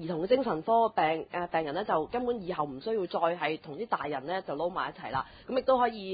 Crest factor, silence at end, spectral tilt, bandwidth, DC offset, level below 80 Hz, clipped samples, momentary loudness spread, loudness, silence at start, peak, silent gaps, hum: 18 dB; 0 s; -3.5 dB/octave; 4.9 kHz; under 0.1%; -62 dBFS; under 0.1%; 8 LU; -31 LUFS; 0 s; -14 dBFS; none; none